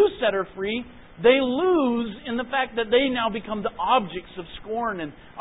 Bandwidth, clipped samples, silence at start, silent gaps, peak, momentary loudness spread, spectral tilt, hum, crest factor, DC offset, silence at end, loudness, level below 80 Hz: 4 kHz; under 0.1%; 0 s; none; -6 dBFS; 14 LU; -9.5 dB/octave; none; 18 dB; under 0.1%; 0 s; -24 LUFS; -52 dBFS